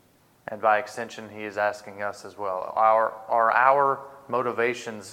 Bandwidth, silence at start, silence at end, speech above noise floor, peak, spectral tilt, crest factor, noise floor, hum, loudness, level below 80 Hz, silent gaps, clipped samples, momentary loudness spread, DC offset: 16.5 kHz; 0.5 s; 0 s; 20 dB; -4 dBFS; -4.5 dB/octave; 20 dB; -44 dBFS; none; -24 LUFS; -76 dBFS; none; under 0.1%; 16 LU; under 0.1%